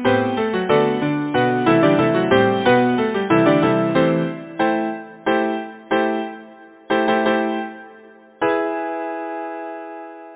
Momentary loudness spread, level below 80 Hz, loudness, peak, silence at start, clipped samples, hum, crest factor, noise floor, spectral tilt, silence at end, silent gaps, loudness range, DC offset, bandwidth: 13 LU; -54 dBFS; -19 LUFS; -2 dBFS; 0 s; under 0.1%; none; 18 dB; -45 dBFS; -10.5 dB/octave; 0 s; none; 6 LU; under 0.1%; 4 kHz